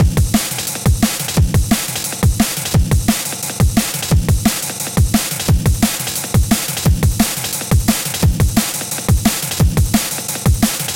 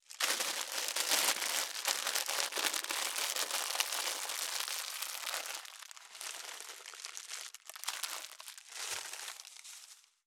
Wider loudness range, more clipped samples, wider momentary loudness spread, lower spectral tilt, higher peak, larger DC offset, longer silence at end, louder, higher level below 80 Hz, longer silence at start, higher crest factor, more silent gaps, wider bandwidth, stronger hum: second, 1 LU vs 10 LU; neither; second, 3 LU vs 15 LU; first, -4.5 dB/octave vs 3 dB/octave; first, 0 dBFS vs -8 dBFS; neither; second, 0 s vs 0.25 s; first, -16 LUFS vs -35 LUFS; first, -22 dBFS vs under -90 dBFS; about the same, 0 s vs 0.1 s; second, 14 dB vs 30 dB; neither; second, 17.5 kHz vs over 20 kHz; neither